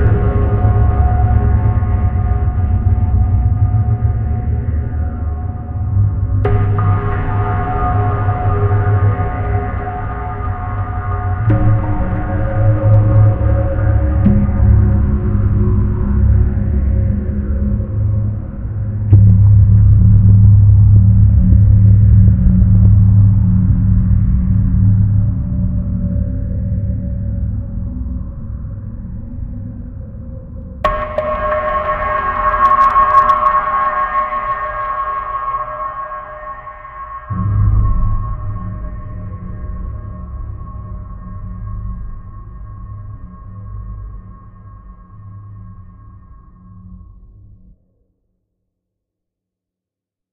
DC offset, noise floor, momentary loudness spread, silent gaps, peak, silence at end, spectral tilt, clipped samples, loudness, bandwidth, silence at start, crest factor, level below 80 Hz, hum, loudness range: under 0.1%; -85 dBFS; 20 LU; none; 0 dBFS; 3.2 s; -11.5 dB/octave; under 0.1%; -14 LUFS; 3.5 kHz; 0 s; 14 dB; -20 dBFS; none; 19 LU